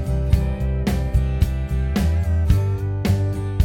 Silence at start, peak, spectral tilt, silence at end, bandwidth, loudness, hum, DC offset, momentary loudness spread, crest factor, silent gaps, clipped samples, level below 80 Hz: 0 s; -4 dBFS; -7.5 dB/octave; 0 s; 16.5 kHz; -21 LUFS; none; under 0.1%; 4 LU; 16 dB; none; under 0.1%; -22 dBFS